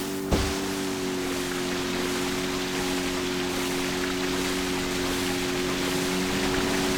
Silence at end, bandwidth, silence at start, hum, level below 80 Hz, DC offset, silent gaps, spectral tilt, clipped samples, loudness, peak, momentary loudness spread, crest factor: 0 s; over 20 kHz; 0 s; none; -42 dBFS; under 0.1%; none; -3.5 dB/octave; under 0.1%; -27 LUFS; -10 dBFS; 3 LU; 18 dB